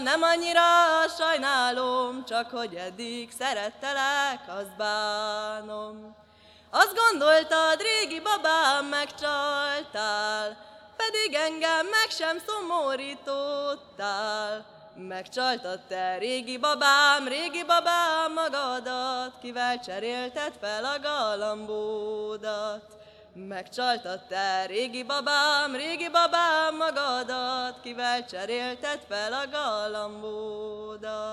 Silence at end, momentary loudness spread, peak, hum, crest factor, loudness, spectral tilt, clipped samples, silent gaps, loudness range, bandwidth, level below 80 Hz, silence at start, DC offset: 0 s; 14 LU; -4 dBFS; none; 24 dB; -26 LUFS; -1 dB/octave; under 0.1%; none; 7 LU; 16 kHz; -70 dBFS; 0 s; under 0.1%